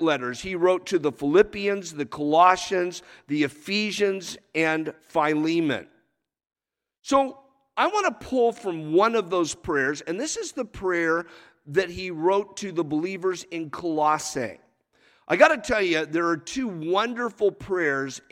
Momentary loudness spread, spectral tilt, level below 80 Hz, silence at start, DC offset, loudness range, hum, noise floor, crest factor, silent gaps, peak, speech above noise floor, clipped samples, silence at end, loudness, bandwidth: 10 LU; -4 dB/octave; -58 dBFS; 0 s; under 0.1%; 4 LU; none; -72 dBFS; 24 dB; none; -2 dBFS; 48 dB; under 0.1%; 0.1 s; -24 LUFS; 15 kHz